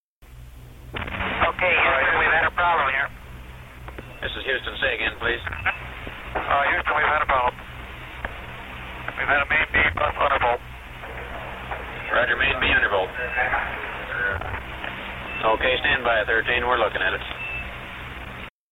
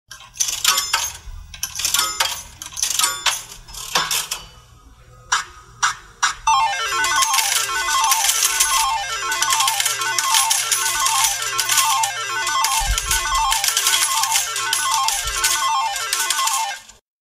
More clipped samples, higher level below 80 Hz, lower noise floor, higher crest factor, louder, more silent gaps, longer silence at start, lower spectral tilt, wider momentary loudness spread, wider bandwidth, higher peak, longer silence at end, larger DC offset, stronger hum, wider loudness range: neither; about the same, -40 dBFS vs -40 dBFS; about the same, -44 dBFS vs -46 dBFS; about the same, 18 dB vs 20 dB; second, -22 LUFS vs -18 LUFS; neither; about the same, 0.2 s vs 0.1 s; first, -5 dB/octave vs 2 dB/octave; first, 17 LU vs 8 LU; about the same, 16.5 kHz vs 16 kHz; second, -6 dBFS vs 0 dBFS; about the same, 0.25 s vs 0.35 s; neither; neither; about the same, 3 LU vs 5 LU